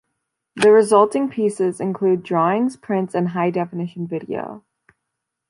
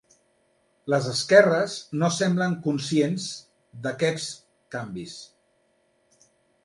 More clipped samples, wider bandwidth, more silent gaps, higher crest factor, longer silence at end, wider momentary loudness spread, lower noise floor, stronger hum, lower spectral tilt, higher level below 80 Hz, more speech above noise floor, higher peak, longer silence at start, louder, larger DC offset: neither; about the same, 11 kHz vs 11.5 kHz; neither; second, 18 dB vs 24 dB; second, 0.9 s vs 1.4 s; second, 14 LU vs 21 LU; first, -80 dBFS vs -67 dBFS; neither; first, -6.5 dB/octave vs -5 dB/octave; about the same, -68 dBFS vs -68 dBFS; first, 61 dB vs 44 dB; about the same, -2 dBFS vs -2 dBFS; second, 0.55 s vs 0.85 s; first, -19 LUFS vs -24 LUFS; neither